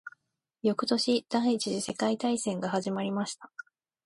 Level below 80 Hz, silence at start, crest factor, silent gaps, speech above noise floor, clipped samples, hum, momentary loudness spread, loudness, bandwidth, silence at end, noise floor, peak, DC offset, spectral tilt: -74 dBFS; 0.05 s; 18 dB; none; 46 dB; under 0.1%; none; 14 LU; -30 LUFS; 11.5 kHz; 0.6 s; -76 dBFS; -14 dBFS; under 0.1%; -4.5 dB/octave